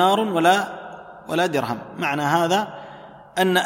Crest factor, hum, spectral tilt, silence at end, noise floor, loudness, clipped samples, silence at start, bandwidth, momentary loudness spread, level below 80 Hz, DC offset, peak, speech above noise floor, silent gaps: 18 dB; none; -4.5 dB/octave; 0 s; -42 dBFS; -21 LUFS; under 0.1%; 0 s; 16.5 kHz; 20 LU; -64 dBFS; under 0.1%; -2 dBFS; 22 dB; none